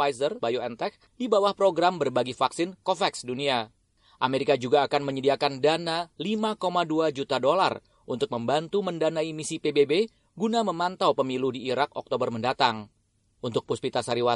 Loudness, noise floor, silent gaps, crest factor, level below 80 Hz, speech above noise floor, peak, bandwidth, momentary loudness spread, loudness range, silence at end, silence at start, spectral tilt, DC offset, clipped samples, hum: -26 LUFS; -68 dBFS; none; 20 dB; -68 dBFS; 42 dB; -6 dBFS; 11.5 kHz; 8 LU; 2 LU; 0 s; 0 s; -4.5 dB/octave; under 0.1%; under 0.1%; none